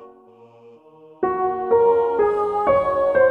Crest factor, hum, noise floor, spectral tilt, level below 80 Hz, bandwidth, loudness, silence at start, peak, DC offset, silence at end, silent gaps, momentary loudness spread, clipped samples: 14 dB; none; -48 dBFS; -7.5 dB/octave; -52 dBFS; 4.5 kHz; -19 LUFS; 0 s; -6 dBFS; under 0.1%; 0 s; none; 6 LU; under 0.1%